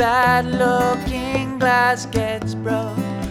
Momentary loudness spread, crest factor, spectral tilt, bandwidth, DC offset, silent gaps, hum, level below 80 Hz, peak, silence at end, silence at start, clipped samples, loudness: 8 LU; 14 dB; -5.5 dB/octave; 17.5 kHz; under 0.1%; none; none; -38 dBFS; -4 dBFS; 0 s; 0 s; under 0.1%; -19 LUFS